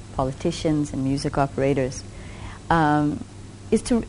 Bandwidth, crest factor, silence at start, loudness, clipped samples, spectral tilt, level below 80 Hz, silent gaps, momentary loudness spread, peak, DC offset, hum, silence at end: 10.5 kHz; 18 dB; 0 s; -23 LUFS; under 0.1%; -6 dB/octave; -40 dBFS; none; 18 LU; -4 dBFS; under 0.1%; none; 0 s